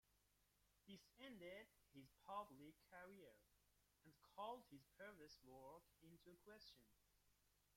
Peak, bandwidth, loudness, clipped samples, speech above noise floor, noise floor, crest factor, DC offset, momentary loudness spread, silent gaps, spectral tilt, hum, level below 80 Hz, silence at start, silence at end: -40 dBFS; 16.5 kHz; -62 LUFS; under 0.1%; 21 dB; -83 dBFS; 24 dB; under 0.1%; 13 LU; none; -4.5 dB/octave; 50 Hz at -85 dBFS; -86 dBFS; 0.05 s; 0 s